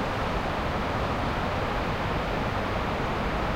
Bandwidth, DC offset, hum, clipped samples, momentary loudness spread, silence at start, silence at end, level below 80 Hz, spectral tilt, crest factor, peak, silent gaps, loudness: 16 kHz; under 0.1%; none; under 0.1%; 0 LU; 0 s; 0 s; -36 dBFS; -6 dB/octave; 12 dB; -16 dBFS; none; -28 LUFS